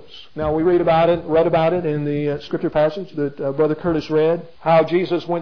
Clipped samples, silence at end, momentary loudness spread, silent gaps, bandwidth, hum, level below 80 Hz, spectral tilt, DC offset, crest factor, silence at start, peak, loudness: under 0.1%; 0 s; 8 LU; none; 5.4 kHz; none; -46 dBFS; -8.5 dB/octave; 0.8%; 14 dB; 0.15 s; -4 dBFS; -19 LUFS